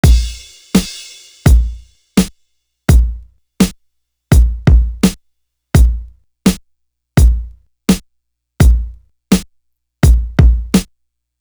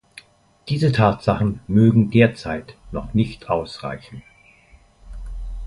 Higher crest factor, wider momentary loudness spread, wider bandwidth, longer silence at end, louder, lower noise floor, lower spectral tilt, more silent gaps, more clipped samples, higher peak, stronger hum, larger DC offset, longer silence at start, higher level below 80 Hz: second, 14 dB vs 20 dB; second, 15 LU vs 21 LU; first, over 20 kHz vs 11.5 kHz; first, 0.6 s vs 0 s; first, -14 LUFS vs -19 LUFS; first, -68 dBFS vs -52 dBFS; second, -6 dB/octave vs -8 dB/octave; neither; neither; about the same, 0 dBFS vs -2 dBFS; neither; neither; second, 0.05 s vs 0.65 s; first, -16 dBFS vs -38 dBFS